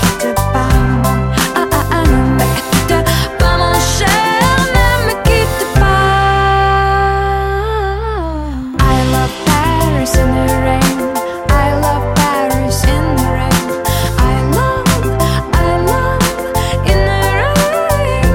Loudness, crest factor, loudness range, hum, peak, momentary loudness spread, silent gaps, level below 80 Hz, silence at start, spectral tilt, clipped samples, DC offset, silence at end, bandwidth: -13 LUFS; 12 dB; 2 LU; none; 0 dBFS; 4 LU; none; -18 dBFS; 0 s; -5 dB/octave; under 0.1%; under 0.1%; 0 s; 17 kHz